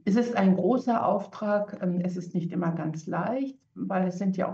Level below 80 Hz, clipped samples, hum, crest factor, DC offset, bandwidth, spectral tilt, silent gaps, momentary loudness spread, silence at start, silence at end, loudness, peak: -72 dBFS; under 0.1%; none; 14 dB; under 0.1%; 7.4 kHz; -8 dB/octave; none; 9 LU; 0.05 s; 0 s; -28 LUFS; -12 dBFS